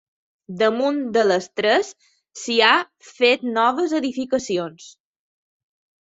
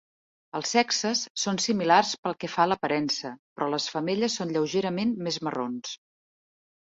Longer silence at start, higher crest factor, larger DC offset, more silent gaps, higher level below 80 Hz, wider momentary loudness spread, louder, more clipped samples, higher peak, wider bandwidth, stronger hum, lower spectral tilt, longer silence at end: about the same, 0.5 s vs 0.55 s; about the same, 20 dB vs 22 dB; neither; second, none vs 1.30-1.35 s, 2.18-2.23 s, 3.39-3.56 s; about the same, -68 dBFS vs -70 dBFS; first, 15 LU vs 11 LU; first, -20 LUFS vs -27 LUFS; neither; first, -2 dBFS vs -6 dBFS; about the same, 8 kHz vs 8 kHz; neither; about the same, -3.5 dB/octave vs -3.5 dB/octave; first, 1.1 s vs 0.9 s